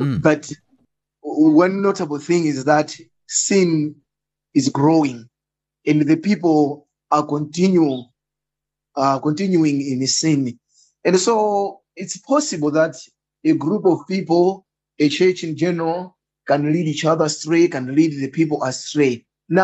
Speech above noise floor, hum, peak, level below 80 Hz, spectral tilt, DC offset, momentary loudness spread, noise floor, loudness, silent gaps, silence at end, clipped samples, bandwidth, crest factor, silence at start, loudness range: 67 dB; none; -2 dBFS; -62 dBFS; -5 dB/octave; under 0.1%; 12 LU; -85 dBFS; -18 LUFS; none; 0 s; under 0.1%; 8.4 kHz; 16 dB; 0 s; 2 LU